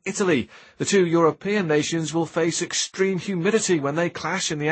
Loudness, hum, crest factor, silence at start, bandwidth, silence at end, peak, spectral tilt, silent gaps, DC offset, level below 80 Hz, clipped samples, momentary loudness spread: -22 LUFS; none; 16 dB; 0.05 s; 8.8 kHz; 0 s; -6 dBFS; -4 dB/octave; none; under 0.1%; -64 dBFS; under 0.1%; 5 LU